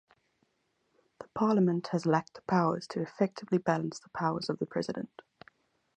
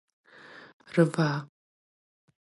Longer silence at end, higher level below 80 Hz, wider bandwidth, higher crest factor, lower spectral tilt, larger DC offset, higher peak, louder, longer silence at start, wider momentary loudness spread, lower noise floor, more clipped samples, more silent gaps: about the same, 0.9 s vs 0.95 s; first, -72 dBFS vs -78 dBFS; second, 9.8 kHz vs 11.5 kHz; about the same, 22 dB vs 22 dB; about the same, -7 dB/octave vs -7 dB/octave; neither; second, -12 dBFS vs -8 dBFS; second, -31 LUFS vs -27 LUFS; first, 1.2 s vs 0.55 s; second, 10 LU vs 25 LU; first, -77 dBFS vs -51 dBFS; neither; second, none vs 0.73-0.80 s